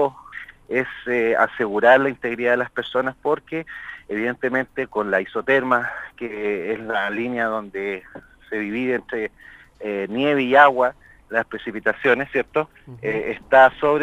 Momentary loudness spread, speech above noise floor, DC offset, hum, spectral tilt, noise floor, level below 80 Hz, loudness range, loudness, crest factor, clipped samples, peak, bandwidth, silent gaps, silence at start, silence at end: 15 LU; 19 dB; under 0.1%; none; -6.5 dB/octave; -40 dBFS; -56 dBFS; 6 LU; -21 LUFS; 22 dB; under 0.1%; 0 dBFS; 14 kHz; none; 0 s; 0 s